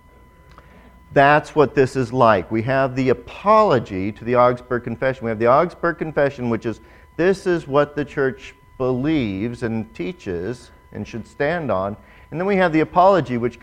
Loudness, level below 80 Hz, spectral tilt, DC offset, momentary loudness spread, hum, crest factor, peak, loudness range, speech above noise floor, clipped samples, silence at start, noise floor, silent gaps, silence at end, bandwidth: -19 LUFS; -46 dBFS; -7 dB/octave; under 0.1%; 15 LU; none; 20 dB; 0 dBFS; 7 LU; 29 dB; under 0.1%; 1.1 s; -48 dBFS; none; 0.05 s; 11 kHz